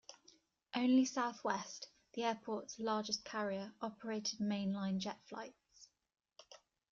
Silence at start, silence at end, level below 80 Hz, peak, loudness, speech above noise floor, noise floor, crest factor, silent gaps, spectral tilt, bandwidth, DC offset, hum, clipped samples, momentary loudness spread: 0.1 s; 0.35 s; -80 dBFS; -22 dBFS; -40 LUFS; 31 dB; -70 dBFS; 18 dB; none; -4 dB/octave; 7.4 kHz; under 0.1%; none; under 0.1%; 17 LU